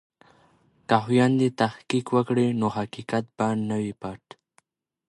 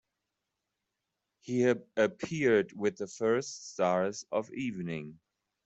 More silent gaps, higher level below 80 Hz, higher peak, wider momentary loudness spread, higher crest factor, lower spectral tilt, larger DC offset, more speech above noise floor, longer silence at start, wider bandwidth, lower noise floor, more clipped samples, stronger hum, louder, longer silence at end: neither; first, -64 dBFS vs -74 dBFS; first, -4 dBFS vs -14 dBFS; about the same, 14 LU vs 12 LU; about the same, 22 dB vs 18 dB; about the same, -6.5 dB/octave vs -5.5 dB/octave; neither; second, 42 dB vs 55 dB; second, 0.9 s vs 1.45 s; first, 11.5 kHz vs 8.2 kHz; second, -66 dBFS vs -86 dBFS; neither; neither; first, -25 LUFS vs -31 LUFS; first, 0.95 s vs 0.5 s